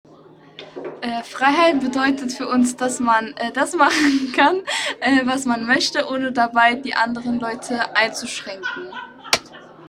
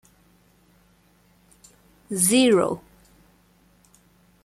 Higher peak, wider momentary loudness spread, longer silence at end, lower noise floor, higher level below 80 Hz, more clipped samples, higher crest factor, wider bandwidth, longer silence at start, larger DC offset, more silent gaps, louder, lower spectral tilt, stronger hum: first, 0 dBFS vs -6 dBFS; second, 12 LU vs 15 LU; second, 0 s vs 1.65 s; second, -46 dBFS vs -60 dBFS; about the same, -60 dBFS vs -62 dBFS; neither; about the same, 20 dB vs 20 dB; about the same, 15.5 kHz vs 15 kHz; second, 0.6 s vs 2.1 s; neither; neither; about the same, -19 LUFS vs -20 LUFS; about the same, -2.5 dB/octave vs -3.5 dB/octave; neither